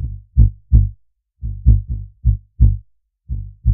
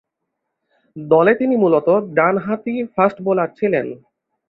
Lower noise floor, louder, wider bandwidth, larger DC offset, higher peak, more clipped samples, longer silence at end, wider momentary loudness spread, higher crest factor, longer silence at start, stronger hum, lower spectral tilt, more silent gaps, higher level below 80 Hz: second, -51 dBFS vs -77 dBFS; about the same, -18 LUFS vs -17 LUFS; second, 0.7 kHz vs 4.8 kHz; neither; about the same, 0 dBFS vs -2 dBFS; neither; second, 0 s vs 0.55 s; first, 14 LU vs 8 LU; about the same, 16 dB vs 16 dB; second, 0 s vs 0.95 s; neither; first, -15 dB/octave vs -10 dB/octave; neither; first, -18 dBFS vs -62 dBFS